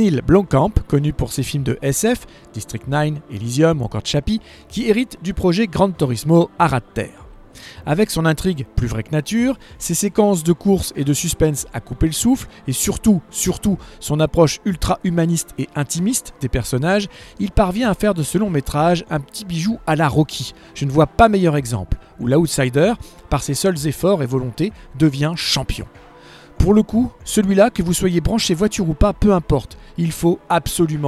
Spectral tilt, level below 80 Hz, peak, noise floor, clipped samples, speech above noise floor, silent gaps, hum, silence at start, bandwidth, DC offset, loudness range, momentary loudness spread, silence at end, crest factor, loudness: -5.5 dB/octave; -32 dBFS; 0 dBFS; -43 dBFS; under 0.1%; 25 dB; none; none; 0 s; 15.5 kHz; under 0.1%; 3 LU; 10 LU; 0 s; 18 dB; -18 LUFS